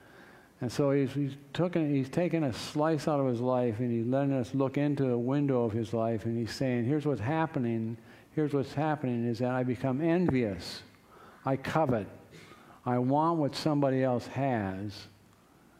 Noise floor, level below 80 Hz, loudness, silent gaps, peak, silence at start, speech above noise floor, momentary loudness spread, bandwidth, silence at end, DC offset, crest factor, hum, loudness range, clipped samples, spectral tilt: -60 dBFS; -66 dBFS; -30 LUFS; none; -12 dBFS; 0.2 s; 31 dB; 9 LU; 14.5 kHz; 0.7 s; under 0.1%; 20 dB; none; 2 LU; under 0.1%; -7.5 dB/octave